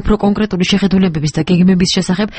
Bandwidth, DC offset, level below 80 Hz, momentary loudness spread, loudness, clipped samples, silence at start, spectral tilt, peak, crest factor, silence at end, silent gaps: 8.8 kHz; under 0.1%; -28 dBFS; 4 LU; -13 LUFS; under 0.1%; 0 s; -6 dB/octave; -2 dBFS; 12 dB; 0 s; none